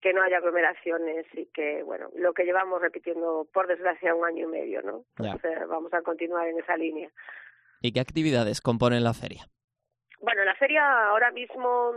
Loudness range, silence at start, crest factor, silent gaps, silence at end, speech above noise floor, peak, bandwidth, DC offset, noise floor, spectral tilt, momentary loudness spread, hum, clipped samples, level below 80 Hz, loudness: 6 LU; 0 s; 18 dB; 9.64-9.68 s; 0 s; 35 dB; -8 dBFS; 11 kHz; under 0.1%; -62 dBFS; -5.5 dB/octave; 13 LU; none; under 0.1%; -62 dBFS; -27 LUFS